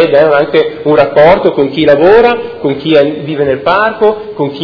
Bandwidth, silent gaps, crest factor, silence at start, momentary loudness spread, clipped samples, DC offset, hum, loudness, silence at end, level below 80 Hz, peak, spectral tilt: 5.4 kHz; none; 8 dB; 0 s; 9 LU; 3%; under 0.1%; none; -9 LUFS; 0 s; -40 dBFS; 0 dBFS; -8 dB/octave